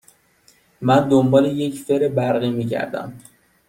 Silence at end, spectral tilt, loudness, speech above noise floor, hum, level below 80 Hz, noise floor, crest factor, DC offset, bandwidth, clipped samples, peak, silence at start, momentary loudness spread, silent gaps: 0.5 s; -7 dB/octave; -19 LUFS; 38 dB; none; -58 dBFS; -57 dBFS; 18 dB; under 0.1%; 16 kHz; under 0.1%; -2 dBFS; 0.8 s; 12 LU; none